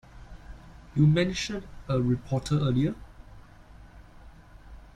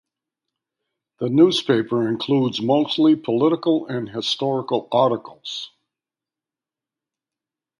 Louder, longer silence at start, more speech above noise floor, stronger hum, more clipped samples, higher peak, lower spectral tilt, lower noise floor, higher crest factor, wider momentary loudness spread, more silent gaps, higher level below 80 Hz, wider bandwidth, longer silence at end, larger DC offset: second, -27 LUFS vs -20 LUFS; second, 0.15 s vs 1.2 s; second, 24 dB vs 70 dB; neither; neither; second, -10 dBFS vs -4 dBFS; about the same, -6.5 dB/octave vs -6 dB/octave; second, -50 dBFS vs -89 dBFS; about the same, 18 dB vs 18 dB; first, 26 LU vs 13 LU; neither; first, -48 dBFS vs -68 dBFS; about the same, 10.5 kHz vs 11 kHz; second, 0.2 s vs 2.1 s; neither